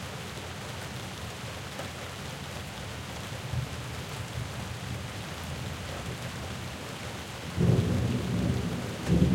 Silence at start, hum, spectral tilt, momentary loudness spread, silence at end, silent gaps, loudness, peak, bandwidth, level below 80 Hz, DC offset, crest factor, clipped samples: 0 s; none; -5.5 dB/octave; 10 LU; 0 s; none; -34 LUFS; -10 dBFS; 16.5 kHz; -46 dBFS; under 0.1%; 22 dB; under 0.1%